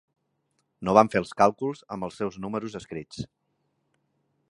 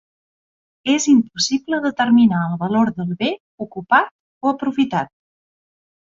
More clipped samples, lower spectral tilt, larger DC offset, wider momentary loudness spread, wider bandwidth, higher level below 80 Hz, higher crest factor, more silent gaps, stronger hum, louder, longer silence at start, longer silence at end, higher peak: neither; first, -6 dB/octave vs -4.5 dB/octave; neither; first, 18 LU vs 14 LU; first, 11.5 kHz vs 7.8 kHz; about the same, -60 dBFS vs -60 dBFS; first, 26 dB vs 18 dB; second, none vs 3.40-3.58 s, 4.11-4.41 s; neither; second, -25 LUFS vs -18 LUFS; about the same, 0.8 s vs 0.85 s; first, 1.25 s vs 1.1 s; about the same, -2 dBFS vs -2 dBFS